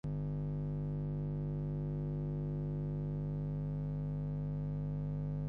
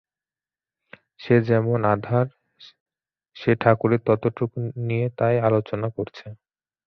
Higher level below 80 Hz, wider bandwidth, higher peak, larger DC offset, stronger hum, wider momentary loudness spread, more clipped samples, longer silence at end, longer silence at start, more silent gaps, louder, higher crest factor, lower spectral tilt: first, -48 dBFS vs -58 dBFS; second, 2.9 kHz vs 5.8 kHz; second, -30 dBFS vs -2 dBFS; neither; first, 50 Hz at -40 dBFS vs none; second, 0 LU vs 12 LU; neither; second, 0 s vs 0.5 s; second, 0.05 s vs 1.2 s; second, none vs 2.80-2.86 s; second, -39 LUFS vs -22 LUFS; second, 8 dB vs 22 dB; first, -12 dB/octave vs -10 dB/octave